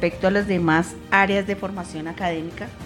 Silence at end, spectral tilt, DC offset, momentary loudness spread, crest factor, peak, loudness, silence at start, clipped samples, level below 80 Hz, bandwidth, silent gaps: 0 s; -6 dB/octave; under 0.1%; 12 LU; 20 dB; -2 dBFS; -22 LUFS; 0 s; under 0.1%; -46 dBFS; 16.5 kHz; none